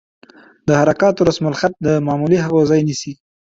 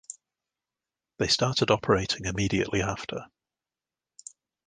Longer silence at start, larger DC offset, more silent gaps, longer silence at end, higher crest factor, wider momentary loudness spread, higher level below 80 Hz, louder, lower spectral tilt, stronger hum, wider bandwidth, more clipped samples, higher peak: first, 0.65 s vs 0.1 s; neither; neither; second, 0.25 s vs 1.45 s; second, 14 dB vs 26 dB; second, 9 LU vs 23 LU; about the same, -48 dBFS vs -50 dBFS; first, -16 LUFS vs -26 LUFS; first, -6.5 dB/octave vs -4 dB/octave; neither; second, 7.8 kHz vs 10 kHz; neither; about the same, -2 dBFS vs -4 dBFS